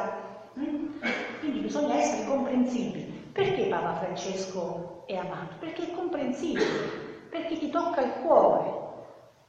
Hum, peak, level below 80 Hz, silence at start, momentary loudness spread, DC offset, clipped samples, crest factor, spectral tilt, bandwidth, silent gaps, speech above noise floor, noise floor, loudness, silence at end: none; -8 dBFS; -66 dBFS; 0 s; 12 LU; under 0.1%; under 0.1%; 22 dB; -5 dB/octave; 8.6 kHz; none; 21 dB; -49 dBFS; -29 LUFS; 0.2 s